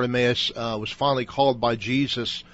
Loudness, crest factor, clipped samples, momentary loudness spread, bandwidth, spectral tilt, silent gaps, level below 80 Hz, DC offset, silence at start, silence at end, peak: -24 LUFS; 16 dB; under 0.1%; 6 LU; 8 kHz; -5.5 dB/octave; none; -52 dBFS; under 0.1%; 0 s; 0.1 s; -8 dBFS